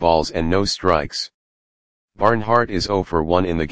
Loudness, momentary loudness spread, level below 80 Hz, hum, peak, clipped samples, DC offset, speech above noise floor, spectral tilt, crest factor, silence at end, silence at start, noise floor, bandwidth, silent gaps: -19 LUFS; 5 LU; -38 dBFS; none; 0 dBFS; under 0.1%; 2%; over 71 dB; -5 dB/octave; 20 dB; 0 s; 0 s; under -90 dBFS; 9.8 kHz; 1.34-2.08 s